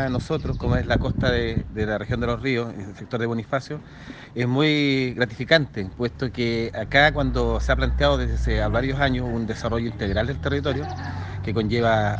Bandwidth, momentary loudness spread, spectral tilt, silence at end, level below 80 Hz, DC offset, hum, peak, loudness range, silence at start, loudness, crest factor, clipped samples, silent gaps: 8.4 kHz; 11 LU; -6.5 dB/octave; 0 s; -32 dBFS; under 0.1%; none; 0 dBFS; 4 LU; 0 s; -23 LUFS; 22 dB; under 0.1%; none